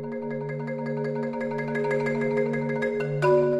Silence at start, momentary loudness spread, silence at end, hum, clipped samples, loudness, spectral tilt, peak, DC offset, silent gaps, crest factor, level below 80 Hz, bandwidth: 0 s; 8 LU; 0 s; none; under 0.1%; -27 LUFS; -8 dB/octave; -10 dBFS; under 0.1%; none; 16 dB; -64 dBFS; 10.5 kHz